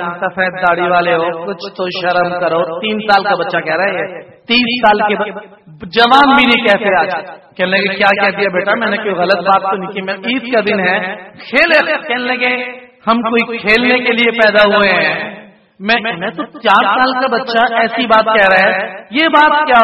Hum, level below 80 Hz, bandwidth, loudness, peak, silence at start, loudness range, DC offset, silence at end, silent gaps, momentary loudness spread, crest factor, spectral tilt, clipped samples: none; -50 dBFS; 10.5 kHz; -12 LUFS; 0 dBFS; 0 s; 3 LU; under 0.1%; 0 s; none; 12 LU; 12 dB; -5.5 dB/octave; 0.1%